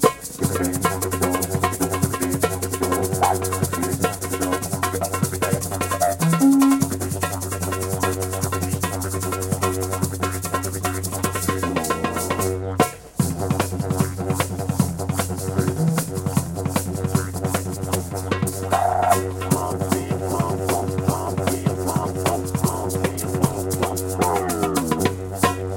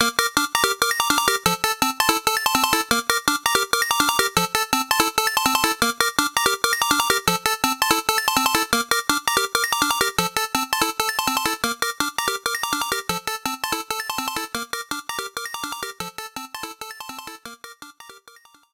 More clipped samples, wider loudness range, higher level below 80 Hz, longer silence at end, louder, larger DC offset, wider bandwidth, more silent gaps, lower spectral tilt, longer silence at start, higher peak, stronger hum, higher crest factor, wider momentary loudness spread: neither; second, 3 LU vs 10 LU; about the same, -48 dBFS vs -52 dBFS; second, 0 s vs 0.55 s; about the same, -22 LUFS vs -20 LUFS; neither; second, 17 kHz vs 19.5 kHz; neither; first, -5 dB/octave vs -1 dB/octave; about the same, 0 s vs 0 s; about the same, -2 dBFS vs -2 dBFS; neither; about the same, 20 dB vs 20 dB; second, 4 LU vs 12 LU